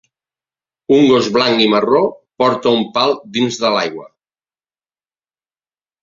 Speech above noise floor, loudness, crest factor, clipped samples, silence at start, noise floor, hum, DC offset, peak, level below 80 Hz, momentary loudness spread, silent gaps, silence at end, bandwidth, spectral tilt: over 76 dB; -14 LUFS; 16 dB; under 0.1%; 0.9 s; under -90 dBFS; none; under 0.1%; 0 dBFS; -58 dBFS; 8 LU; none; 2 s; 7.6 kHz; -4.5 dB/octave